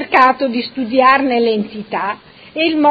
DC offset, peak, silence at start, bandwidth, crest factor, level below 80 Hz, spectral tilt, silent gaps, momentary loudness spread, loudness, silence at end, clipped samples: under 0.1%; 0 dBFS; 0 s; 7.8 kHz; 14 dB; -58 dBFS; -6.5 dB/octave; none; 12 LU; -15 LUFS; 0 s; under 0.1%